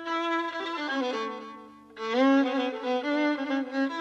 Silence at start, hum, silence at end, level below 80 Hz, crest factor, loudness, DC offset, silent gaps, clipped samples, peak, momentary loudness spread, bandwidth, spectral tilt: 0 s; 50 Hz at -75 dBFS; 0 s; -80 dBFS; 16 dB; -28 LUFS; under 0.1%; none; under 0.1%; -14 dBFS; 16 LU; 7.8 kHz; -3.5 dB/octave